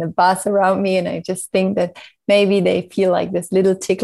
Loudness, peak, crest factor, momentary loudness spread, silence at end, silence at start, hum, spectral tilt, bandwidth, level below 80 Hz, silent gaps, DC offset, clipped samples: -17 LUFS; -2 dBFS; 14 dB; 8 LU; 0 s; 0 s; none; -5.5 dB/octave; 12.5 kHz; -62 dBFS; none; under 0.1%; under 0.1%